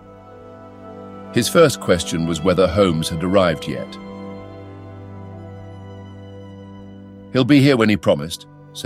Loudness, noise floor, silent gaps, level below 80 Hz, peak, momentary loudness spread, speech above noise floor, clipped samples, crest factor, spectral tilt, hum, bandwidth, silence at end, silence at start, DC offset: -17 LUFS; -41 dBFS; none; -46 dBFS; -2 dBFS; 24 LU; 24 dB; under 0.1%; 18 dB; -5.5 dB/octave; none; 16 kHz; 0 s; 0.1 s; under 0.1%